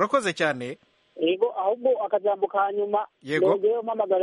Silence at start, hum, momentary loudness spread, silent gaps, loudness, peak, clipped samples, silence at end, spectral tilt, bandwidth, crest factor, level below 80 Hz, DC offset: 0 s; none; 6 LU; none; -25 LUFS; -8 dBFS; under 0.1%; 0 s; -5 dB/octave; 11.5 kHz; 16 dB; -76 dBFS; under 0.1%